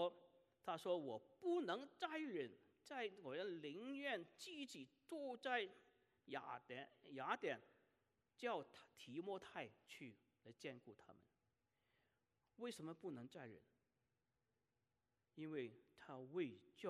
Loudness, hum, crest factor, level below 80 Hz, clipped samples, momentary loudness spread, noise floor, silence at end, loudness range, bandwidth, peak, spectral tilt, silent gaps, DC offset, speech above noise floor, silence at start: -51 LUFS; none; 24 dB; under -90 dBFS; under 0.1%; 15 LU; under -90 dBFS; 0 s; 10 LU; 13 kHz; -28 dBFS; -5 dB/octave; none; under 0.1%; over 40 dB; 0 s